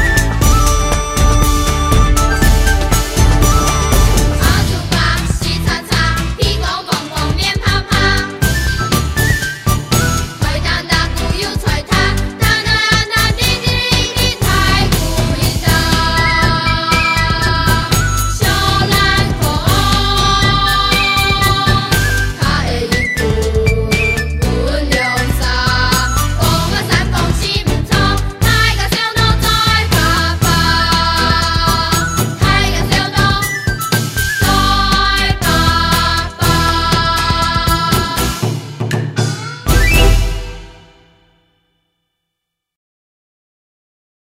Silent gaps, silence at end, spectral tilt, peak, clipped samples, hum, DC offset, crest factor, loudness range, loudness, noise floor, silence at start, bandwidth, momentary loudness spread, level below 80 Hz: none; 3.6 s; -4 dB/octave; 0 dBFS; under 0.1%; none; under 0.1%; 14 dB; 3 LU; -13 LUFS; -77 dBFS; 0 s; 16.5 kHz; 5 LU; -18 dBFS